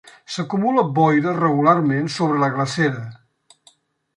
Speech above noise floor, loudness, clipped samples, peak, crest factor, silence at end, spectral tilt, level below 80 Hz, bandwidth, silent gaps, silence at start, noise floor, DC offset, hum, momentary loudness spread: 38 dB; -19 LUFS; under 0.1%; -2 dBFS; 18 dB; 1 s; -6.5 dB/octave; -64 dBFS; 11 kHz; none; 0.3 s; -56 dBFS; under 0.1%; none; 12 LU